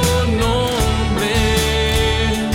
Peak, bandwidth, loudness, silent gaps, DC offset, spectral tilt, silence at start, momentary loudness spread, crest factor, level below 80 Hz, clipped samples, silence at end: -4 dBFS; 17 kHz; -17 LUFS; none; under 0.1%; -4.5 dB/octave; 0 s; 2 LU; 12 dB; -22 dBFS; under 0.1%; 0 s